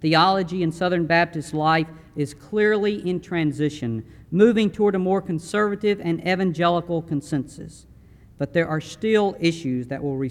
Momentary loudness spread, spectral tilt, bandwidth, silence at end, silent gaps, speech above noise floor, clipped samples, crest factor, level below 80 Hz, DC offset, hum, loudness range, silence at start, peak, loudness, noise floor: 11 LU; -6.5 dB/octave; 12.5 kHz; 0 s; none; 27 dB; under 0.1%; 18 dB; -54 dBFS; under 0.1%; none; 4 LU; 0 s; -4 dBFS; -22 LUFS; -49 dBFS